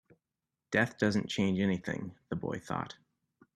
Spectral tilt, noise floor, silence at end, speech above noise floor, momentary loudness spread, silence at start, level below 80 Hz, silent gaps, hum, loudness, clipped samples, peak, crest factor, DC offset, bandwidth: -6 dB/octave; -89 dBFS; 0.65 s; 56 dB; 11 LU; 0.7 s; -66 dBFS; none; none; -33 LUFS; under 0.1%; -14 dBFS; 22 dB; under 0.1%; 12 kHz